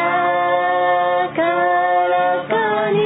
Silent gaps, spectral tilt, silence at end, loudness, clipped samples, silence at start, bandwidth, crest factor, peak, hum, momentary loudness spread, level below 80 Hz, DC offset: none; -10 dB/octave; 0 s; -17 LUFS; under 0.1%; 0 s; 4 kHz; 10 dB; -6 dBFS; none; 2 LU; -62 dBFS; under 0.1%